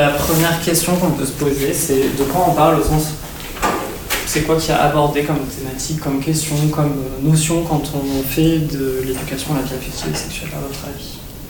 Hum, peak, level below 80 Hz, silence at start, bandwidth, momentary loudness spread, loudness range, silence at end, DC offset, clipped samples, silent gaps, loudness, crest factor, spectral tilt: none; -2 dBFS; -34 dBFS; 0 s; 19.5 kHz; 10 LU; 3 LU; 0 s; under 0.1%; under 0.1%; none; -18 LUFS; 16 dB; -5 dB/octave